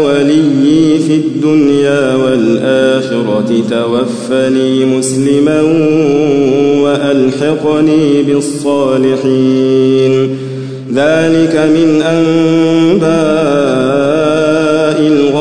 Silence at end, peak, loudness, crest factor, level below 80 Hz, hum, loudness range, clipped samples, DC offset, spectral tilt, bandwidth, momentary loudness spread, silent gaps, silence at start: 0 s; 0 dBFS; -10 LUFS; 10 dB; -48 dBFS; none; 2 LU; under 0.1%; 0.7%; -6 dB/octave; 10.5 kHz; 4 LU; none; 0 s